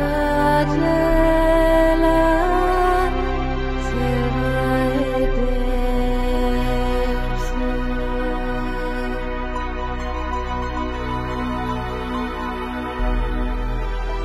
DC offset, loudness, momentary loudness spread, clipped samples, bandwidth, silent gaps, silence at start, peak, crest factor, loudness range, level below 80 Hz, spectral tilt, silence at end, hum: under 0.1%; -21 LUFS; 10 LU; under 0.1%; 13 kHz; none; 0 s; -4 dBFS; 16 dB; 8 LU; -24 dBFS; -6.5 dB/octave; 0 s; none